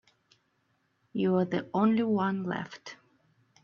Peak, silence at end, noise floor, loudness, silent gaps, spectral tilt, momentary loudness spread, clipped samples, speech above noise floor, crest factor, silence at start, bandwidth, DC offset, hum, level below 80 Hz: -14 dBFS; 0.7 s; -74 dBFS; -29 LUFS; none; -8 dB/octave; 16 LU; under 0.1%; 45 dB; 16 dB; 1.15 s; 7 kHz; under 0.1%; none; -72 dBFS